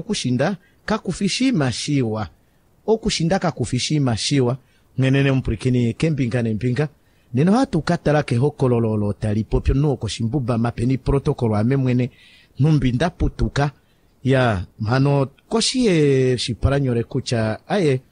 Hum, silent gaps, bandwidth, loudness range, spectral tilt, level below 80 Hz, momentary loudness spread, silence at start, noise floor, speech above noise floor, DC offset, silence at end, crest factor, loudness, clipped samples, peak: none; none; 10.5 kHz; 2 LU; -6 dB/octave; -36 dBFS; 6 LU; 0 s; -57 dBFS; 38 dB; under 0.1%; 0.1 s; 16 dB; -20 LUFS; under 0.1%; -4 dBFS